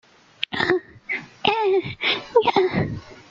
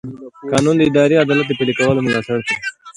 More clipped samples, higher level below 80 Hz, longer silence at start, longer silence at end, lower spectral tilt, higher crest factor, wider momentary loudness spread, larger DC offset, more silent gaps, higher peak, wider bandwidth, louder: neither; about the same, -54 dBFS vs -50 dBFS; first, 0.5 s vs 0.05 s; about the same, 0.15 s vs 0.05 s; about the same, -6 dB/octave vs -5.5 dB/octave; first, 22 dB vs 16 dB; about the same, 10 LU vs 9 LU; neither; neither; about the same, -2 dBFS vs 0 dBFS; second, 7.4 kHz vs 11.5 kHz; second, -22 LUFS vs -16 LUFS